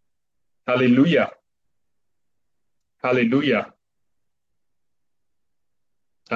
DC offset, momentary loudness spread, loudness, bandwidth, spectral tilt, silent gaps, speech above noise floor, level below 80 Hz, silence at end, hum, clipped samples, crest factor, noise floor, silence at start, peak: under 0.1%; 12 LU; -20 LUFS; 7.2 kHz; -7.5 dB/octave; none; 67 dB; -70 dBFS; 0 s; none; under 0.1%; 20 dB; -85 dBFS; 0.65 s; -6 dBFS